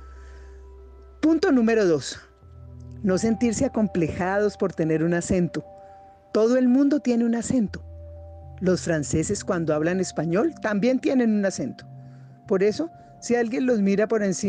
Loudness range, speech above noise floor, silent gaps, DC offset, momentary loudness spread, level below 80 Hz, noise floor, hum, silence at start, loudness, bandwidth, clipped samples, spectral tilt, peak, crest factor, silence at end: 2 LU; 26 dB; none; under 0.1%; 18 LU; -50 dBFS; -48 dBFS; none; 0 s; -23 LUFS; 9.8 kHz; under 0.1%; -6 dB/octave; -12 dBFS; 12 dB; 0 s